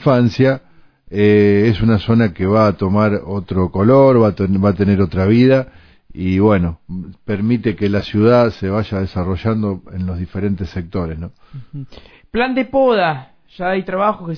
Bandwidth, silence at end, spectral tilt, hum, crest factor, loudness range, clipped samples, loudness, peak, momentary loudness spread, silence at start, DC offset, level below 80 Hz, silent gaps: 5.4 kHz; 0 s; -9 dB/octave; none; 14 dB; 8 LU; under 0.1%; -16 LUFS; 0 dBFS; 14 LU; 0 s; under 0.1%; -40 dBFS; none